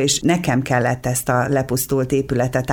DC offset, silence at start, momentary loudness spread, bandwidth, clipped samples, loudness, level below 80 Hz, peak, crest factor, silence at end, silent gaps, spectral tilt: under 0.1%; 0 s; 3 LU; 20 kHz; under 0.1%; -19 LUFS; -42 dBFS; -4 dBFS; 16 dB; 0 s; none; -4.5 dB/octave